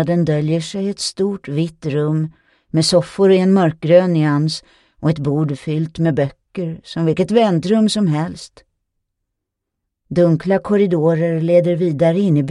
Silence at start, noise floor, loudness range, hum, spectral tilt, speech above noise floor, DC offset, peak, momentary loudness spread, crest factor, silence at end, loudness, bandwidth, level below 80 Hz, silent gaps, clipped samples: 0 s; -79 dBFS; 4 LU; none; -6.5 dB/octave; 63 dB; under 0.1%; 0 dBFS; 9 LU; 16 dB; 0 s; -17 LUFS; 11 kHz; -52 dBFS; none; under 0.1%